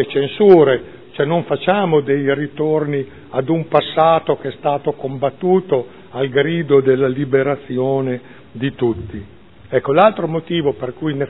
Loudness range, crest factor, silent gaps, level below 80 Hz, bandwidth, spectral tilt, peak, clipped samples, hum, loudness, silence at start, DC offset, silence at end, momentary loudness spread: 3 LU; 16 dB; none; -52 dBFS; 4.1 kHz; -10.5 dB/octave; 0 dBFS; under 0.1%; none; -17 LUFS; 0 s; 0.5%; 0 s; 11 LU